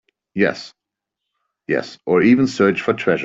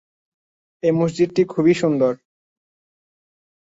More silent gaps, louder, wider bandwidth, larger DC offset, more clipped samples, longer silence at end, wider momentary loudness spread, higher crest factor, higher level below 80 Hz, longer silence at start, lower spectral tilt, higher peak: neither; about the same, -18 LUFS vs -19 LUFS; about the same, 7.8 kHz vs 8 kHz; neither; neither; second, 0 s vs 1.55 s; first, 16 LU vs 5 LU; about the same, 16 dB vs 16 dB; about the same, -58 dBFS vs -62 dBFS; second, 0.35 s vs 0.85 s; about the same, -6.5 dB/octave vs -7 dB/octave; first, -2 dBFS vs -6 dBFS